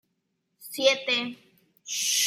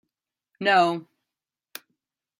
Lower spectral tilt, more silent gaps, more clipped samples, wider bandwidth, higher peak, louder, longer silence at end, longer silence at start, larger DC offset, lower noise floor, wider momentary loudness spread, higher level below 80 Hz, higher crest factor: second, 0.5 dB/octave vs -4.5 dB/octave; neither; neither; about the same, 16 kHz vs 16 kHz; about the same, -8 dBFS vs -8 dBFS; second, -26 LUFS vs -22 LUFS; second, 0 s vs 1.35 s; about the same, 0.6 s vs 0.6 s; neither; second, -77 dBFS vs -88 dBFS; about the same, 22 LU vs 23 LU; second, -84 dBFS vs -76 dBFS; about the same, 22 dB vs 20 dB